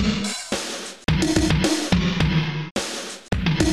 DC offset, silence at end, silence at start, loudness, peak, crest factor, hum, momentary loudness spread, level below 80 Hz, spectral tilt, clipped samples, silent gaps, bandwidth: 0.4%; 0 s; 0 s; -23 LUFS; -6 dBFS; 16 dB; none; 8 LU; -34 dBFS; -4.5 dB/octave; under 0.1%; 2.71-2.75 s; 13.5 kHz